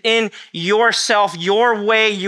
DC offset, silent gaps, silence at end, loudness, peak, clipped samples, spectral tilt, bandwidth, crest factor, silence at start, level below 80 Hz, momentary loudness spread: under 0.1%; none; 0 s; -16 LUFS; 0 dBFS; under 0.1%; -2.5 dB/octave; 12.5 kHz; 16 dB; 0.05 s; -76 dBFS; 5 LU